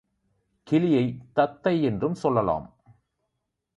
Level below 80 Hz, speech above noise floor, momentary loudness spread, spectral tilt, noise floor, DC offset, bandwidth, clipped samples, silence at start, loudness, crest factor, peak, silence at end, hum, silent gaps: -56 dBFS; 57 dB; 5 LU; -8.5 dB/octave; -81 dBFS; under 0.1%; 10.5 kHz; under 0.1%; 0.65 s; -25 LUFS; 20 dB; -8 dBFS; 1.1 s; none; none